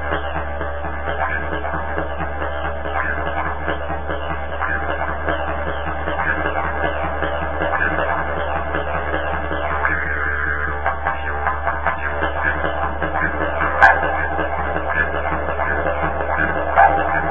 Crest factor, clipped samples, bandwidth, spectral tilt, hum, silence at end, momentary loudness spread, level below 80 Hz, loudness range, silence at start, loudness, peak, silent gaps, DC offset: 22 dB; under 0.1%; 7.6 kHz; -7.5 dB/octave; none; 0 s; 7 LU; -30 dBFS; 5 LU; 0 s; -21 LUFS; 0 dBFS; none; 4%